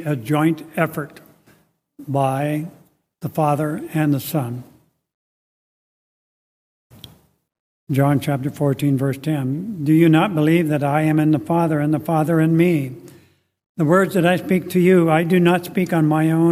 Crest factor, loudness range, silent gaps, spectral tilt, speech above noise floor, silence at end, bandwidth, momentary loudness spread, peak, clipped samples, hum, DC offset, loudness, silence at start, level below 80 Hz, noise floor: 16 dB; 9 LU; 5.14-6.90 s, 7.59-7.87 s, 13.66-13.75 s; -7.5 dB/octave; 39 dB; 0 s; 16 kHz; 10 LU; -2 dBFS; under 0.1%; none; under 0.1%; -18 LUFS; 0 s; -60 dBFS; -57 dBFS